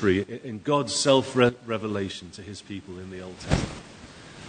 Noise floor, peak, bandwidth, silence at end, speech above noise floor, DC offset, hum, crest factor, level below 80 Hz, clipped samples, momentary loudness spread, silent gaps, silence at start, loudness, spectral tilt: -45 dBFS; -4 dBFS; 9.6 kHz; 0 s; 19 dB; under 0.1%; none; 22 dB; -46 dBFS; under 0.1%; 19 LU; none; 0 s; -25 LUFS; -4.5 dB/octave